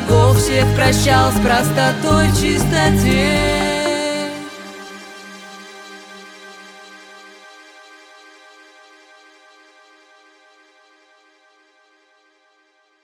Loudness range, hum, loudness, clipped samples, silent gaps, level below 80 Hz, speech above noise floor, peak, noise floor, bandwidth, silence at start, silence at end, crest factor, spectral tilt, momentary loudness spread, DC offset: 25 LU; none; -15 LUFS; under 0.1%; none; -32 dBFS; 45 dB; -2 dBFS; -59 dBFS; 18 kHz; 0 s; 6.05 s; 18 dB; -5 dB/octave; 24 LU; under 0.1%